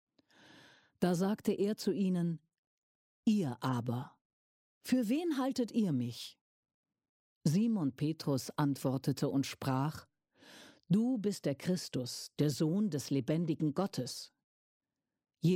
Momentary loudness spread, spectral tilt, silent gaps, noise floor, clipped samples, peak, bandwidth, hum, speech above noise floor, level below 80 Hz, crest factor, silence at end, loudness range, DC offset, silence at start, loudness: 9 LU; -6.5 dB/octave; 2.58-3.23 s, 4.21-4.81 s, 6.41-6.63 s, 6.74-6.83 s, 7.09-7.41 s, 14.44-14.80 s; -63 dBFS; under 0.1%; -18 dBFS; 16.5 kHz; none; 29 dB; -76 dBFS; 18 dB; 0 s; 2 LU; under 0.1%; 1 s; -35 LUFS